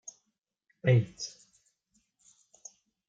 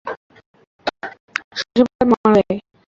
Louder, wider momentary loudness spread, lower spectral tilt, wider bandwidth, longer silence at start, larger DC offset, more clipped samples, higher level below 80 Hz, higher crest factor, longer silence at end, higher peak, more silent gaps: second, -30 LUFS vs -18 LUFS; first, 25 LU vs 17 LU; about the same, -6 dB/octave vs -6 dB/octave; about the same, 7.8 kHz vs 7.4 kHz; first, 0.85 s vs 0.05 s; neither; neither; second, -72 dBFS vs -52 dBFS; about the same, 22 dB vs 18 dB; first, 1.8 s vs 0.3 s; second, -12 dBFS vs -2 dBFS; second, none vs 0.17-0.30 s, 0.46-0.54 s, 0.67-0.79 s, 1.20-1.28 s, 1.44-1.51 s, 1.95-1.99 s, 2.17-2.24 s